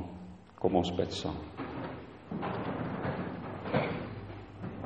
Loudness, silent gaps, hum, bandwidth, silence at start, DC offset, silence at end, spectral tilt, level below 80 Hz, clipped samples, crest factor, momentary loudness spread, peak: -36 LUFS; none; none; 8.4 kHz; 0 s; under 0.1%; 0 s; -6.5 dB/octave; -56 dBFS; under 0.1%; 22 dB; 14 LU; -14 dBFS